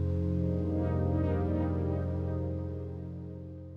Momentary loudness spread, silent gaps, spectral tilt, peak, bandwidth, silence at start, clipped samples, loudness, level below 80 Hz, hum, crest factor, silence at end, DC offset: 11 LU; none; -11 dB/octave; -18 dBFS; 4 kHz; 0 s; under 0.1%; -33 LUFS; -50 dBFS; none; 14 dB; 0 s; under 0.1%